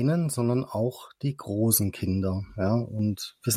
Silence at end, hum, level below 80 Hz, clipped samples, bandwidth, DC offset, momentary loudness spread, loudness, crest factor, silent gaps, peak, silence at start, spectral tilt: 0 s; none; -60 dBFS; under 0.1%; 16 kHz; under 0.1%; 9 LU; -27 LUFS; 18 dB; none; -8 dBFS; 0 s; -5.5 dB/octave